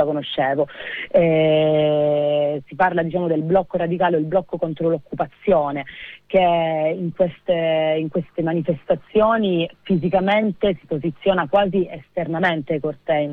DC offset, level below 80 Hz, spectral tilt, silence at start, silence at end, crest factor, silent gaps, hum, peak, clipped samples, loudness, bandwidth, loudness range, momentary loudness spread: under 0.1%; -50 dBFS; -9 dB/octave; 0 s; 0 s; 14 dB; none; none; -6 dBFS; under 0.1%; -20 LUFS; 4.5 kHz; 2 LU; 8 LU